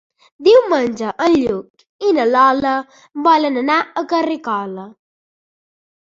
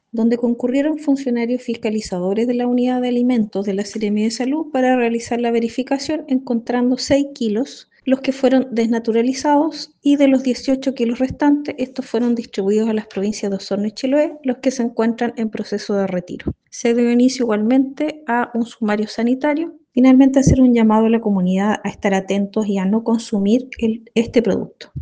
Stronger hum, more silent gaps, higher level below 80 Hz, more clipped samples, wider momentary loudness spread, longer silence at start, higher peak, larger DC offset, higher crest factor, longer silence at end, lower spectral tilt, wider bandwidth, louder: neither; first, 1.70-1.74 s, 1.89-1.99 s vs none; second, -56 dBFS vs -44 dBFS; neither; first, 11 LU vs 8 LU; first, 0.4 s vs 0.15 s; about the same, -2 dBFS vs 0 dBFS; neither; about the same, 16 dB vs 16 dB; first, 1.15 s vs 0 s; about the same, -5 dB/octave vs -6 dB/octave; second, 7.6 kHz vs 9.4 kHz; about the same, -16 LUFS vs -18 LUFS